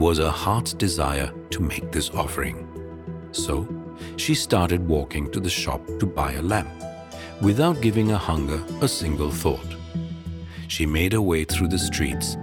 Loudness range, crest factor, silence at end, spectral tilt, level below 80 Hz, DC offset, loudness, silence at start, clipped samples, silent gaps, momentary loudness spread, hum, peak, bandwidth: 3 LU; 20 dB; 0 s; -5 dB/octave; -36 dBFS; under 0.1%; -24 LUFS; 0 s; under 0.1%; none; 14 LU; none; -4 dBFS; 17.5 kHz